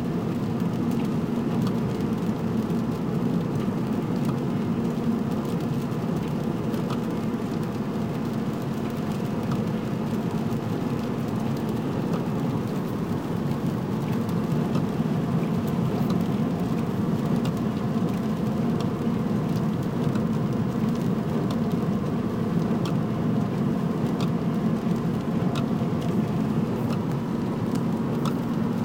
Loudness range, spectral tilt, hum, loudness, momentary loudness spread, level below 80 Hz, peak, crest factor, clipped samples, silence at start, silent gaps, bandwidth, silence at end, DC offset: 2 LU; -8 dB/octave; none; -26 LUFS; 3 LU; -50 dBFS; -12 dBFS; 14 dB; under 0.1%; 0 s; none; 16.5 kHz; 0 s; 0.1%